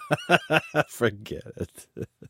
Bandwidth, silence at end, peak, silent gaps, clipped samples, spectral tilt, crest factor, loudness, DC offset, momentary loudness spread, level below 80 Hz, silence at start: 16.5 kHz; 0 s; -2 dBFS; none; under 0.1%; -5 dB/octave; 24 dB; -24 LUFS; under 0.1%; 17 LU; -58 dBFS; 0 s